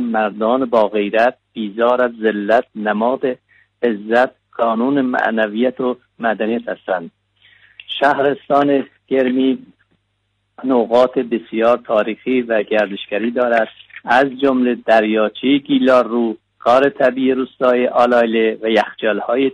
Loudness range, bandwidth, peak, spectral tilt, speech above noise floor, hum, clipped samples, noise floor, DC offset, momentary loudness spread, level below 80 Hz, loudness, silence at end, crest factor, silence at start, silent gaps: 4 LU; 8.8 kHz; -2 dBFS; -6.5 dB/octave; 52 dB; none; under 0.1%; -68 dBFS; under 0.1%; 8 LU; -60 dBFS; -16 LUFS; 0 s; 14 dB; 0 s; none